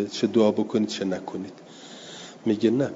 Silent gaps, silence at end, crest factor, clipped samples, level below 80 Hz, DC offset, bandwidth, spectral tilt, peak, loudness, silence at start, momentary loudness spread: none; 0 s; 18 dB; under 0.1%; -70 dBFS; under 0.1%; 7.8 kHz; -6 dB/octave; -8 dBFS; -25 LUFS; 0 s; 20 LU